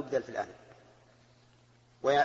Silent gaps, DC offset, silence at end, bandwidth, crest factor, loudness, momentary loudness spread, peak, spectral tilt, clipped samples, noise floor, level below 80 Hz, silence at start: none; under 0.1%; 0 s; 7.8 kHz; 20 dB; -34 LUFS; 26 LU; -14 dBFS; -4.5 dB/octave; under 0.1%; -63 dBFS; -72 dBFS; 0 s